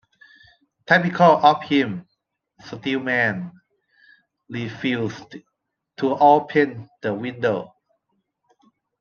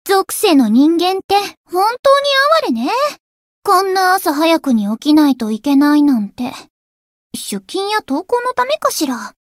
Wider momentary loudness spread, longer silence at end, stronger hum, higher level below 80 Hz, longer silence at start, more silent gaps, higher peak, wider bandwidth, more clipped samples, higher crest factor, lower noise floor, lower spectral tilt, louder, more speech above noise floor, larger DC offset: first, 18 LU vs 11 LU; first, 1.35 s vs 0.2 s; neither; second, -68 dBFS vs -60 dBFS; first, 0.9 s vs 0.05 s; second, none vs 1.24-1.29 s, 1.57-1.64 s, 1.99-2.03 s, 3.20-3.62 s, 6.70-7.30 s; about the same, 0 dBFS vs -2 dBFS; second, 7 kHz vs 16.5 kHz; neither; first, 22 dB vs 14 dB; second, -75 dBFS vs under -90 dBFS; first, -6.5 dB/octave vs -3.5 dB/octave; second, -20 LUFS vs -14 LUFS; second, 55 dB vs over 76 dB; neither